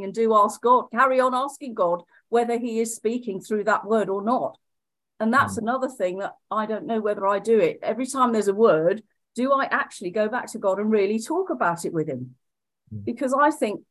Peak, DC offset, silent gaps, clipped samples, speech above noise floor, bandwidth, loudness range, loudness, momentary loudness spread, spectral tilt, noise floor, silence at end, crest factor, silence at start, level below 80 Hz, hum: -6 dBFS; under 0.1%; none; under 0.1%; 63 dB; 12.5 kHz; 3 LU; -23 LUFS; 10 LU; -5 dB/octave; -86 dBFS; 0.1 s; 18 dB; 0 s; -66 dBFS; none